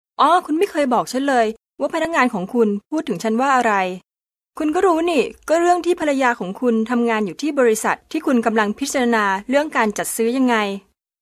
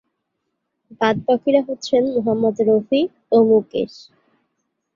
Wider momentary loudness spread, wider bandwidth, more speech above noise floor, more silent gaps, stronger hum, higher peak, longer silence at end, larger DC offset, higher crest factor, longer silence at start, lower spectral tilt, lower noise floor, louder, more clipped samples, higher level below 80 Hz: about the same, 6 LU vs 6 LU; first, 14 kHz vs 7.4 kHz; second, 53 dB vs 58 dB; neither; neither; about the same, -2 dBFS vs -2 dBFS; second, 0.45 s vs 1.1 s; neither; about the same, 16 dB vs 18 dB; second, 0.2 s vs 0.9 s; second, -4 dB/octave vs -6.5 dB/octave; second, -71 dBFS vs -75 dBFS; about the same, -19 LUFS vs -18 LUFS; neither; about the same, -58 dBFS vs -60 dBFS